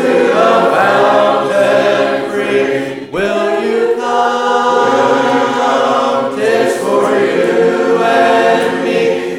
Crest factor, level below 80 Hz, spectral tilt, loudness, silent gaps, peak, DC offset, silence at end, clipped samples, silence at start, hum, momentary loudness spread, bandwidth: 12 dB; -54 dBFS; -4.5 dB/octave; -12 LUFS; none; 0 dBFS; 0.1%; 0 s; under 0.1%; 0 s; none; 5 LU; 15.5 kHz